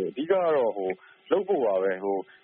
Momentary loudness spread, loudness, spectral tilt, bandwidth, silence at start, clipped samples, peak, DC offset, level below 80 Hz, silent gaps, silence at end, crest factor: 9 LU; -26 LUFS; -4 dB/octave; 4.2 kHz; 0 s; under 0.1%; -10 dBFS; under 0.1%; -74 dBFS; none; 0.2 s; 16 dB